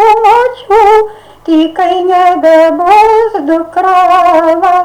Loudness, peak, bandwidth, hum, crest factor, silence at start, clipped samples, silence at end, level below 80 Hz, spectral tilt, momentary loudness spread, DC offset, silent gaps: -7 LUFS; 0 dBFS; 18 kHz; none; 6 dB; 0 s; 0.5%; 0 s; -42 dBFS; -4 dB/octave; 6 LU; under 0.1%; none